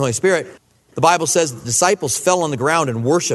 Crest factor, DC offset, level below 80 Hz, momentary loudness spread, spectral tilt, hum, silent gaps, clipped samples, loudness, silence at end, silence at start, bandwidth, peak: 16 dB; under 0.1%; -56 dBFS; 3 LU; -3.5 dB/octave; none; none; under 0.1%; -17 LUFS; 0 s; 0 s; 12.5 kHz; 0 dBFS